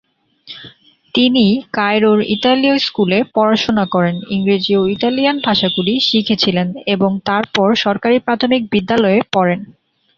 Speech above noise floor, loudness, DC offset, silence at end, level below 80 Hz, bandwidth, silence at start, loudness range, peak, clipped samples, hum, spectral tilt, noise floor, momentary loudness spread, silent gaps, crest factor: 28 dB; -14 LUFS; under 0.1%; 0.45 s; -52 dBFS; 7.2 kHz; 0.45 s; 1 LU; 0 dBFS; under 0.1%; none; -6 dB/octave; -42 dBFS; 5 LU; none; 14 dB